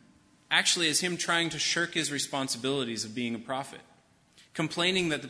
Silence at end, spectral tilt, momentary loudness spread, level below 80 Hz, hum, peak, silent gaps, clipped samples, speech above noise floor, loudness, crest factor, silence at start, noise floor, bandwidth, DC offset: 0 s; -2 dB/octave; 11 LU; -68 dBFS; none; -8 dBFS; none; under 0.1%; 31 dB; -28 LUFS; 22 dB; 0.5 s; -61 dBFS; 11 kHz; under 0.1%